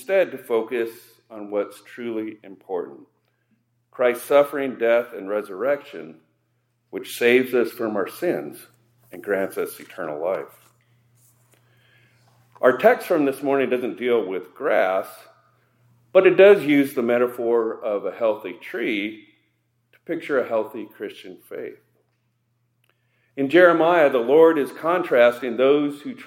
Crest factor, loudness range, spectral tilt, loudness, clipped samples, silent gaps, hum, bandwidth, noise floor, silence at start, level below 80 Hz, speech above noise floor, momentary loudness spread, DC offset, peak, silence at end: 20 dB; 11 LU; -5.5 dB/octave; -21 LUFS; under 0.1%; none; none; 16.5 kHz; -70 dBFS; 0 s; -80 dBFS; 49 dB; 20 LU; under 0.1%; -2 dBFS; 0 s